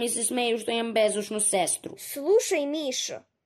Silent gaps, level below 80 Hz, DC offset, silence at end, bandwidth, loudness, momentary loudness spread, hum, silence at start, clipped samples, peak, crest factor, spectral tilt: none; -76 dBFS; under 0.1%; 0.25 s; 15 kHz; -26 LUFS; 7 LU; none; 0 s; under 0.1%; -12 dBFS; 14 dB; -2 dB/octave